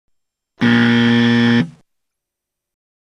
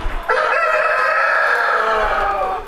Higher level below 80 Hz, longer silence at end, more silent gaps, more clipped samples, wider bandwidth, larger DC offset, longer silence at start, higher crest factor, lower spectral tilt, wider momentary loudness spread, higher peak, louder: second, -56 dBFS vs -32 dBFS; first, 1.35 s vs 0 s; neither; neither; second, 7.2 kHz vs 14 kHz; neither; first, 0.6 s vs 0 s; about the same, 16 dB vs 14 dB; first, -6.5 dB/octave vs -3 dB/octave; about the same, 6 LU vs 4 LU; about the same, -2 dBFS vs -4 dBFS; about the same, -14 LUFS vs -16 LUFS